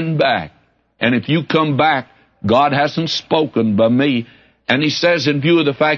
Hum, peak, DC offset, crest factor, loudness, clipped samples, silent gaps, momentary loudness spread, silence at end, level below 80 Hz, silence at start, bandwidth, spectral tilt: none; -2 dBFS; under 0.1%; 14 dB; -16 LUFS; under 0.1%; none; 8 LU; 0 s; -56 dBFS; 0 s; 7 kHz; -6 dB/octave